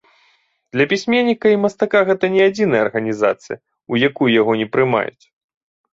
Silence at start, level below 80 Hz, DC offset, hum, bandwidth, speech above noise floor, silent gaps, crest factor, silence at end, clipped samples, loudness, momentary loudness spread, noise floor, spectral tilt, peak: 0.75 s; -60 dBFS; under 0.1%; none; 7.8 kHz; 43 dB; none; 16 dB; 0.85 s; under 0.1%; -17 LUFS; 9 LU; -60 dBFS; -6 dB/octave; -2 dBFS